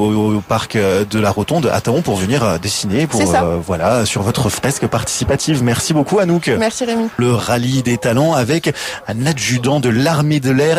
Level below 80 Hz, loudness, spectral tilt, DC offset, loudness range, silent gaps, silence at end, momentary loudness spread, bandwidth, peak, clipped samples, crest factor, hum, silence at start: -40 dBFS; -15 LUFS; -5 dB/octave; under 0.1%; 1 LU; none; 0 s; 4 LU; 16 kHz; -4 dBFS; under 0.1%; 12 dB; none; 0 s